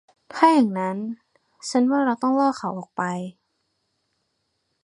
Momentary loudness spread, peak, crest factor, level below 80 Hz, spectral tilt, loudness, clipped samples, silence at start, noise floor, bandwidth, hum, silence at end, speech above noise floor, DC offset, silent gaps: 18 LU; -2 dBFS; 22 dB; -76 dBFS; -5.5 dB/octave; -22 LUFS; under 0.1%; 0.3 s; -74 dBFS; 10.5 kHz; none; 1.55 s; 53 dB; under 0.1%; none